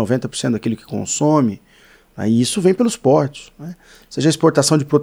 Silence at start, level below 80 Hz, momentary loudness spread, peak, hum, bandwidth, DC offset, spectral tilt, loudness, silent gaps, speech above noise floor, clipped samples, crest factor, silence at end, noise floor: 0 s; -56 dBFS; 19 LU; -2 dBFS; none; 19.5 kHz; under 0.1%; -5.5 dB/octave; -17 LUFS; none; 33 dB; under 0.1%; 16 dB; 0 s; -50 dBFS